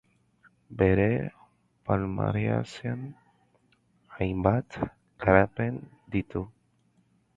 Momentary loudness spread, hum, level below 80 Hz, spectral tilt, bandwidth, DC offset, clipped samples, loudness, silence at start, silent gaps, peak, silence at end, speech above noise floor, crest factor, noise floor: 17 LU; none; -48 dBFS; -8.5 dB/octave; 7.8 kHz; under 0.1%; under 0.1%; -28 LUFS; 0.7 s; none; -4 dBFS; 0.85 s; 41 dB; 26 dB; -67 dBFS